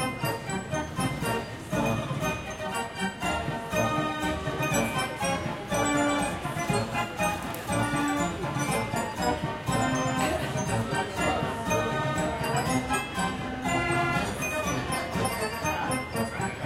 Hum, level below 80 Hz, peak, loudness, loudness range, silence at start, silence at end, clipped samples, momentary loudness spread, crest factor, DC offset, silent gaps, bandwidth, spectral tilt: none; -48 dBFS; -12 dBFS; -28 LUFS; 2 LU; 0 s; 0 s; under 0.1%; 5 LU; 16 dB; under 0.1%; none; 16.5 kHz; -4.5 dB/octave